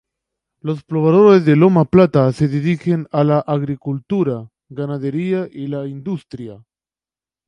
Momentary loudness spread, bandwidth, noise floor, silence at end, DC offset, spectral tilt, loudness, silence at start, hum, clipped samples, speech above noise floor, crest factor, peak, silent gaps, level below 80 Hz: 16 LU; 10 kHz; under -90 dBFS; 0.9 s; under 0.1%; -9 dB/octave; -16 LUFS; 0.65 s; none; under 0.1%; over 74 dB; 16 dB; 0 dBFS; none; -52 dBFS